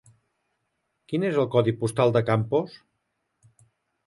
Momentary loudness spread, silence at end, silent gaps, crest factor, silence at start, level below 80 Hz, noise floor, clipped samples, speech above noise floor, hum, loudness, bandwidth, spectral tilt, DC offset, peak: 7 LU; 1.35 s; none; 20 dB; 1.1 s; -62 dBFS; -77 dBFS; under 0.1%; 54 dB; none; -24 LUFS; 11.5 kHz; -7 dB/octave; under 0.1%; -6 dBFS